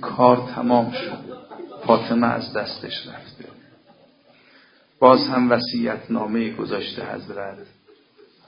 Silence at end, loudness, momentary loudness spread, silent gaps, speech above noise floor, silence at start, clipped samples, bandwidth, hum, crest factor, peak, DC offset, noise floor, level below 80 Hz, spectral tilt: 0.85 s; -21 LUFS; 19 LU; none; 34 dB; 0 s; under 0.1%; 5.4 kHz; none; 22 dB; 0 dBFS; under 0.1%; -54 dBFS; -62 dBFS; -9.5 dB/octave